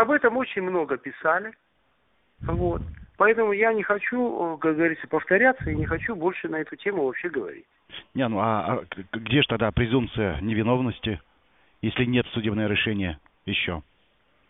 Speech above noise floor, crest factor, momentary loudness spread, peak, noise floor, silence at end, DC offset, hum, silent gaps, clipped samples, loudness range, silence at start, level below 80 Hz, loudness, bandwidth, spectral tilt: 43 dB; 20 dB; 12 LU; -4 dBFS; -68 dBFS; 0.7 s; under 0.1%; none; none; under 0.1%; 4 LU; 0 s; -44 dBFS; -25 LUFS; 4 kHz; -4 dB/octave